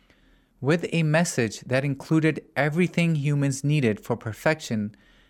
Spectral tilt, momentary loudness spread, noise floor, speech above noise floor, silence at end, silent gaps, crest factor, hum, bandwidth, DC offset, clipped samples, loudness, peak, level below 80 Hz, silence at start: -6 dB/octave; 7 LU; -59 dBFS; 35 dB; 0.4 s; none; 18 dB; none; 13.5 kHz; under 0.1%; under 0.1%; -25 LUFS; -6 dBFS; -62 dBFS; 0.6 s